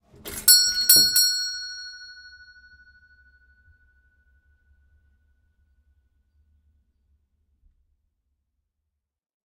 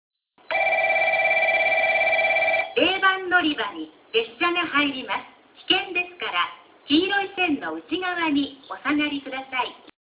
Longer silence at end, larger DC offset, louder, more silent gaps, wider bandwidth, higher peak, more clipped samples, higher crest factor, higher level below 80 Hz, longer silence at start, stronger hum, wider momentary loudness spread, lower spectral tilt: first, 7.35 s vs 0.3 s; neither; first, -16 LUFS vs -22 LUFS; neither; first, 15.5 kHz vs 4 kHz; first, 0 dBFS vs -6 dBFS; neither; first, 28 dB vs 18 dB; about the same, -60 dBFS vs -64 dBFS; second, 0.25 s vs 0.5 s; neither; first, 25 LU vs 10 LU; second, 2 dB/octave vs -6.5 dB/octave